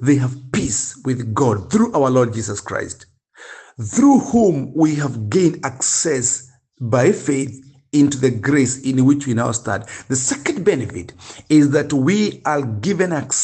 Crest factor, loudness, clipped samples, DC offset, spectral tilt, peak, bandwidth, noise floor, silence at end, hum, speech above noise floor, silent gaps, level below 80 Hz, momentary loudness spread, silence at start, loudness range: 16 dB; -18 LUFS; under 0.1%; under 0.1%; -5 dB/octave; -2 dBFS; 9.2 kHz; -41 dBFS; 0 s; none; 24 dB; none; -52 dBFS; 11 LU; 0 s; 2 LU